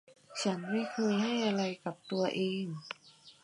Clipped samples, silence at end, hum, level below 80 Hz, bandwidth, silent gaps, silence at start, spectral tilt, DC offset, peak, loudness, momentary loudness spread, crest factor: under 0.1%; 0.1 s; none; -84 dBFS; 11 kHz; none; 0.1 s; -5 dB/octave; under 0.1%; -18 dBFS; -34 LUFS; 13 LU; 16 dB